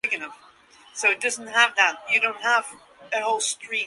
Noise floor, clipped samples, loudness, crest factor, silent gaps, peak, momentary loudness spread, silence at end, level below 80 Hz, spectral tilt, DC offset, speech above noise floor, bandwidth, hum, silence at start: -53 dBFS; under 0.1%; -22 LUFS; 22 dB; none; -4 dBFS; 11 LU; 0 s; -76 dBFS; 1 dB/octave; under 0.1%; 29 dB; 11.5 kHz; none; 0.05 s